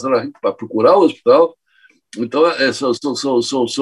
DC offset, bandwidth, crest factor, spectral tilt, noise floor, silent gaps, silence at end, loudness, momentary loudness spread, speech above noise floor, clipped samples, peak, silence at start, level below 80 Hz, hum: under 0.1%; 11.5 kHz; 14 dB; -4 dB/octave; -54 dBFS; none; 0 s; -15 LUFS; 10 LU; 39 dB; under 0.1%; -2 dBFS; 0 s; -66 dBFS; none